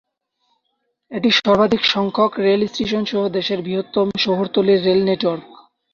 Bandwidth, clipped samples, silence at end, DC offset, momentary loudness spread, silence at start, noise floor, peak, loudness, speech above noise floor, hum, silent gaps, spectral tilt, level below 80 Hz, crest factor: 7 kHz; under 0.1%; 0.4 s; under 0.1%; 7 LU; 1.1 s; -72 dBFS; -2 dBFS; -18 LUFS; 54 dB; none; none; -5.5 dB/octave; -56 dBFS; 16 dB